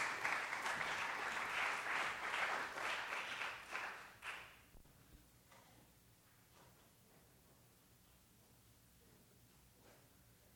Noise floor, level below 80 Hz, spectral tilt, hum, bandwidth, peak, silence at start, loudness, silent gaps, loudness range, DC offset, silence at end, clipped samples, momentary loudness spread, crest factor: -69 dBFS; -76 dBFS; -1.5 dB/octave; none; over 20 kHz; -24 dBFS; 0 s; -42 LUFS; none; 25 LU; under 0.1%; 0 s; under 0.1%; 25 LU; 22 dB